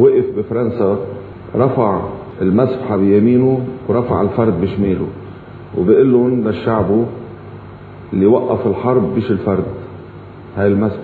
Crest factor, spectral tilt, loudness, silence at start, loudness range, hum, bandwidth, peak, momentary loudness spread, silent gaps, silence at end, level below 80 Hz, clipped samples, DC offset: 14 dB; -11.5 dB/octave; -15 LUFS; 0 s; 2 LU; none; 4.5 kHz; 0 dBFS; 21 LU; none; 0 s; -44 dBFS; under 0.1%; under 0.1%